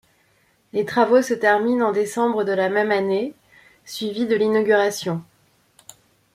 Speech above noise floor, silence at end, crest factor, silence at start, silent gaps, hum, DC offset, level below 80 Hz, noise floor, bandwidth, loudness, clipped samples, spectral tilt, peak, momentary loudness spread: 42 dB; 1.1 s; 18 dB; 0.75 s; none; none; under 0.1%; -68 dBFS; -62 dBFS; 15.5 kHz; -20 LUFS; under 0.1%; -5 dB/octave; -4 dBFS; 11 LU